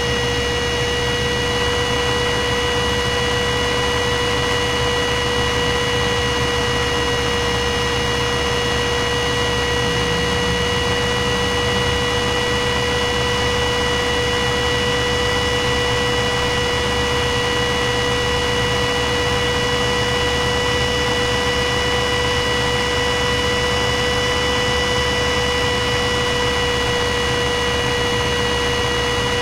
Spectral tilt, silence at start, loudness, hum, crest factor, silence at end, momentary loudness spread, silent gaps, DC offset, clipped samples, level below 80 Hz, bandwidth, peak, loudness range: -3.5 dB/octave; 0 s; -18 LUFS; none; 12 dB; 0 s; 1 LU; none; 0.1%; under 0.1%; -30 dBFS; 16 kHz; -6 dBFS; 1 LU